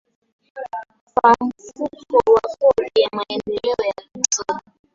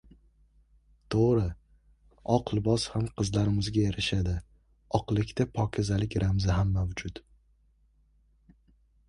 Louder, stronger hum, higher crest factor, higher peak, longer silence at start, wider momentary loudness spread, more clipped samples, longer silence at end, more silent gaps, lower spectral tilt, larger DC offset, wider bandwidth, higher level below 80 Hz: first, -19 LUFS vs -29 LUFS; neither; about the same, 20 dB vs 22 dB; first, 0 dBFS vs -8 dBFS; second, 0.55 s vs 1.1 s; first, 16 LU vs 9 LU; neither; second, 0.35 s vs 1.9 s; first, 1.01-1.07 s vs none; second, -2.5 dB/octave vs -6.5 dB/octave; neither; second, 7.8 kHz vs 11 kHz; second, -54 dBFS vs -42 dBFS